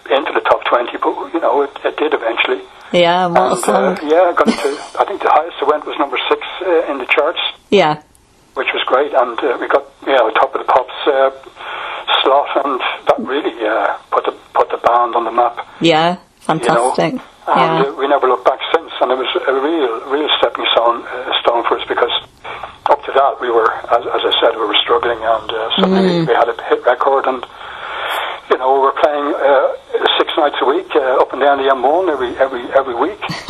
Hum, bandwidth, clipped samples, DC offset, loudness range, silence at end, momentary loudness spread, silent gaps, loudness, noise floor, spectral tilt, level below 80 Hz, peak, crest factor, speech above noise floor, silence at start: none; 13.5 kHz; under 0.1%; under 0.1%; 2 LU; 0 s; 7 LU; none; -15 LUFS; -42 dBFS; -4.5 dB/octave; -54 dBFS; 0 dBFS; 14 dB; 28 dB; 0.05 s